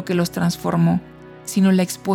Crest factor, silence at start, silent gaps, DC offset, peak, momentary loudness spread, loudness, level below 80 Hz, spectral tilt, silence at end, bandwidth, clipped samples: 14 dB; 0 s; none; under 0.1%; -6 dBFS; 8 LU; -19 LUFS; -52 dBFS; -6 dB/octave; 0 s; 16.5 kHz; under 0.1%